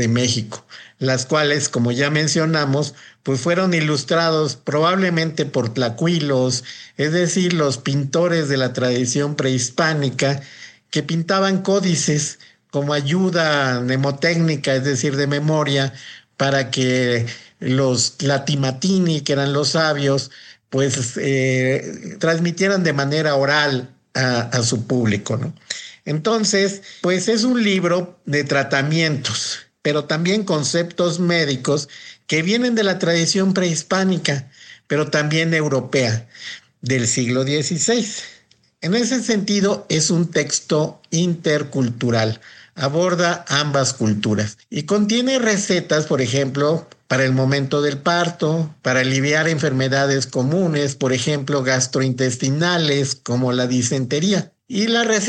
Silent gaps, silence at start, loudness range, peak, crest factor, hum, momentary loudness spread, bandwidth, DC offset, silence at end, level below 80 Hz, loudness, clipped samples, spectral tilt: none; 0 s; 2 LU; -4 dBFS; 16 dB; none; 7 LU; 10 kHz; under 0.1%; 0 s; -62 dBFS; -19 LUFS; under 0.1%; -4.5 dB/octave